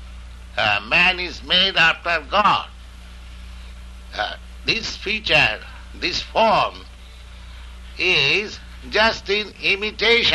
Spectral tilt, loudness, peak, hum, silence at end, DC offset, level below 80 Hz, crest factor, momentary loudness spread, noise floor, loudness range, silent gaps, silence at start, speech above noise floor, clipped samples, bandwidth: -3 dB/octave; -18 LUFS; -4 dBFS; none; 0 s; under 0.1%; -40 dBFS; 18 dB; 24 LU; -39 dBFS; 4 LU; none; 0 s; 20 dB; under 0.1%; 12 kHz